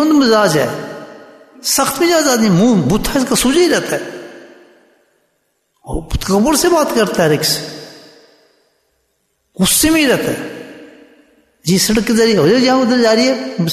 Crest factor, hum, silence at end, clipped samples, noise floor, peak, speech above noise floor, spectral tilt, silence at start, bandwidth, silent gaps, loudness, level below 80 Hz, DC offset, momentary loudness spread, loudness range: 14 dB; none; 0 s; under 0.1%; -65 dBFS; -2 dBFS; 52 dB; -4 dB/octave; 0 s; 14 kHz; none; -13 LUFS; -36 dBFS; under 0.1%; 16 LU; 4 LU